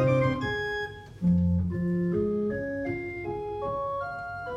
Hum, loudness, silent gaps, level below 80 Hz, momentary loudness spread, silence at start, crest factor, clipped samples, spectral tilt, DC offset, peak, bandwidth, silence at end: none; -29 LUFS; none; -46 dBFS; 9 LU; 0 s; 14 dB; under 0.1%; -8.5 dB/octave; under 0.1%; -14 dBFS; 7.4 kHz; 0 s